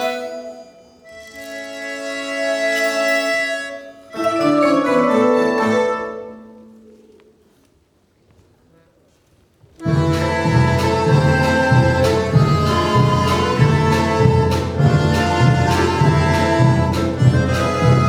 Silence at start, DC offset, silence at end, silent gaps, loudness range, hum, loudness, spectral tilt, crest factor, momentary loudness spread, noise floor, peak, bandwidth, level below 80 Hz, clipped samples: 0 s; under 0.1%; 0 s; none; 8 LU; none; -16 LUFS; -6.5 dB/octave; 16 dB; 14 LU; -58 dBFS; 0 dBFS; 19.5 kHz; -40 dBFS; under 0.1%